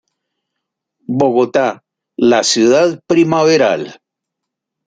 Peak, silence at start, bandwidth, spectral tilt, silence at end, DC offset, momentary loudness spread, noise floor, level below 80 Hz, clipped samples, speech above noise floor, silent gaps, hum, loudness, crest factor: -2 dBFS; 1.1 s; 9.4 kHz; -4.5 dB/octave; 0.95 s; under 0.1%; 11 LU; -79 dBFS; -60 dBFS; under 0.1%; 67 dB; none; none; -13 LUFS; 14 dB